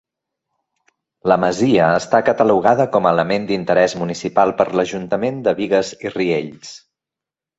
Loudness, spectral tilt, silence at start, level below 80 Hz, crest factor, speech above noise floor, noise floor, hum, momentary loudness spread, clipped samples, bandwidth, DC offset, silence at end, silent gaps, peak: -17 LUFS; -5.5 dB/octave; 1.25 s; -56 dBFS; 16 dB; 71 dB; -87 dBFS; none; 9 LU; under 0.1%; 8.2 kHz; under 0.1%; 0.8 s; none; -2 dBFS